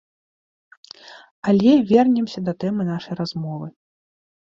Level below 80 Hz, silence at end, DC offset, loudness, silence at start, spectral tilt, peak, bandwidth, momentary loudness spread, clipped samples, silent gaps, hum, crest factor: -62 dBFS; 0.9 s; under 0.1%; -20 LUFS; 1.05 s; -8 dB/octave; -2 dBFS; 7.4 kHz; 19 LU; under 0.1%; 1.31-1.42 s; none; 18 dB